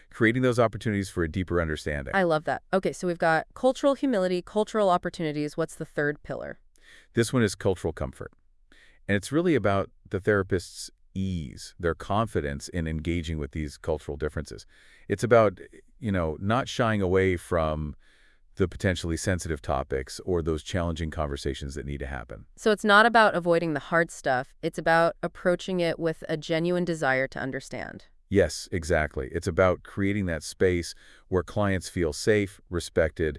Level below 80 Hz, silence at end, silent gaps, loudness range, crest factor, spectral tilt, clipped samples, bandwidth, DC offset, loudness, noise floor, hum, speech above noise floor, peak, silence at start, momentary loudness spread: -46 dBFS; 0 s; none; 6 LU; 22 dB; -5.5 dB/octave; under 0.1%; 12 kHz; under 0.1%; -27 LUFS; -57 dBFS; none; 30 dB; -6 dBFS; 0.1 s; 12 LU